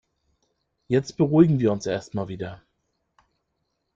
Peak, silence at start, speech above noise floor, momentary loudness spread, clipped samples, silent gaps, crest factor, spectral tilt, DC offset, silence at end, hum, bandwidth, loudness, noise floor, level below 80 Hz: -4 dBFS; 0.9 s; 54 dB; 15 LU; under 0.1%; none; 22 dB; -7.5 dB/octave; under 0.1%; 1.4 s; none; 7.6 kHz; -23 LUFS; -76 dBFS; -60 dBFS